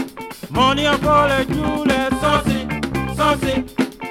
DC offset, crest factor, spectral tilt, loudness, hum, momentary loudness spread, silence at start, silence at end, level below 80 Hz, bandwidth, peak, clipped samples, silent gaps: under 0.1%; 16 dB; -5 dB/octave; -18 LUFS; none; 8 LU; 0 s; 0 s; -34 dBFS; 16.5 kHz; -4 dBFS; under 0.1%; none